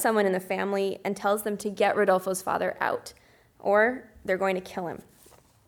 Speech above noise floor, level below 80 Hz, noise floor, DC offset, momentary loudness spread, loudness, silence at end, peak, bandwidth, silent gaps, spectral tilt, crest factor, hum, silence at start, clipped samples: 30 dB; -64 dBFS; -57 dBFS; under 0.1%; 12 LU; -27 LUFS; 0.7 s; -10 dBFS; over 20 kHz; none; -4.5 dB/octave; 18 dB; none; 0 s; under 0.1%